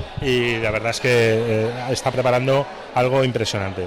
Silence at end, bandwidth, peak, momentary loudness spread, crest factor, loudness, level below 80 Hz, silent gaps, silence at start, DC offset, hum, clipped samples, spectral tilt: 0 s; 16.5 kHz; -10 dBFS; 6 LU; 10 dB; -20 LUFS; -44 dBFS; none; 0 s; under 0.1%; none; under 0.1%; -5 dB/octave